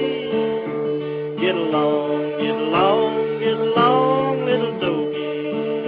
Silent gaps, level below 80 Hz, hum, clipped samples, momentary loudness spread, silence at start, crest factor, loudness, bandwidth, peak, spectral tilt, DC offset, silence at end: none; -64 dBFS; none; under 0.1%; 8 LU; 0 s; 16 dB; -20 LUFS; 5 kHz; -4 dBFS; -9.5 dB/octave; under 0.1%; 0 s